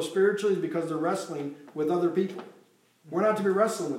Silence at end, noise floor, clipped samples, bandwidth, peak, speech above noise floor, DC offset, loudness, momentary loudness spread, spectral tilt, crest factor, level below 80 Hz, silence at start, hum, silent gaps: 0 s; -61 dBFS; under 0.1%; 15.5 kHz; -10 dBFS; 34 dB; under 0.1%; -28 LUFS; 11 LU; -5.5 dB/octave; 18 dB; -88 dBFS; 0 s; none; none